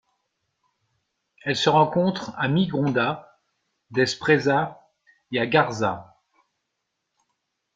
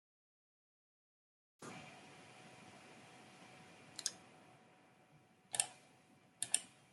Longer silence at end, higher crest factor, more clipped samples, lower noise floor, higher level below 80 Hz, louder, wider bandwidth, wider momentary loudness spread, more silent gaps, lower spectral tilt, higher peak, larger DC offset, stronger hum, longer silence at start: first, 1.7 s vs 0 s; second, 22 dB vs 38 dB; neither; first, -79 dBFS vs -69 dBFS; first, -64 dBFS vs under -90 dBFS; first, -23 LUFS vs -42 LUFS; second, 9.2 kHz vs 16 kHz; second, 11 LU vs 23 LU; neither; first, -5.5 dB/octave vs 0 dB/octave; first, -4 dBFS vs -14 dBFS; neither; neither; second, 1.45 s vs 1.6 s